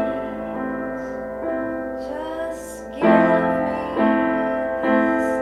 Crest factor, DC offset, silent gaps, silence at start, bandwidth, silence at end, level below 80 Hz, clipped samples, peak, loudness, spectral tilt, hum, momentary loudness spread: 18 dB; under 0.1%; none; 0 s; 13.5 kHz; 0 s; -48 dBFS; under 0.1%; -2 dBFS; -22 LUFS; -6.5 dB/octave; none; 12 LU